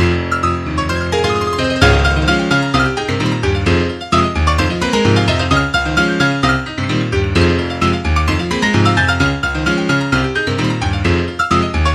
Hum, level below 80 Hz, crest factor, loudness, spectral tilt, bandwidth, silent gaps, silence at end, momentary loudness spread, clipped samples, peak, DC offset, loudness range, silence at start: none; -24 dBFS; 14 dB; -15 LUFS; -5.5 dB/octave; 12.5 kHz; none; 0 s; 4 LU; under 0.1%; 0 dBFS; under 0.1%; 1 LU; 0 s